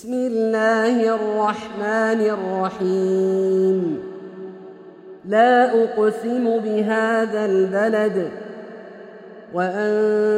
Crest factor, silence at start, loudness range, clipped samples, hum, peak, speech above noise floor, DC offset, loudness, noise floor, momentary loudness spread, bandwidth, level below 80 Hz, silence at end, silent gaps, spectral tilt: 16 dB; 0 s; 3 LU; under 0.1%; none; -4 dBFS; 22 dB; under 0.1%; -20 LUFS; -41 dBFS; 19 LU; 10.5 kHz; -68 dBFS; 0 s; none; -6.5 dB/octave